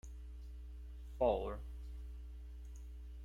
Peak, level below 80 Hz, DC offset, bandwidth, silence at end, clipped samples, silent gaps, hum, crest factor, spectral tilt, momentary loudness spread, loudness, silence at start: -20 dBFS; -48 dBFS; under 0.1%; 11 kHz; 0 s; under 0.1%; none; none; 22 dB; -7.5 dB/octave; 17 LU; -44 LUFS; 0.05 s